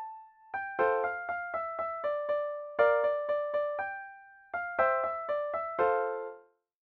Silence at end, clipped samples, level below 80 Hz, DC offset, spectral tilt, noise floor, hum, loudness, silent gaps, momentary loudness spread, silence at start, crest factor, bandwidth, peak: 0.45 s; under 0.1%; -72 dBFS; under 0.1%; -6 dB/octave; -54 dBFS; none; -32 LUFS; none; 12 LU; 0 s; 18 dB; 4.6 kHz; -14 dBFS